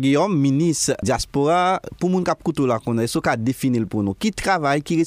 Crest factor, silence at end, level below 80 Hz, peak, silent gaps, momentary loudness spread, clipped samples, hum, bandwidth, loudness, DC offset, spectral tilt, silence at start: 14 dB; 0 s; -44 dBFS; -6 dBFS; none; 5 LU; under 0.1%; none; 15.5 kHz; -20 LUFS; under 0.1%; -5.5 dB/octave; 0 s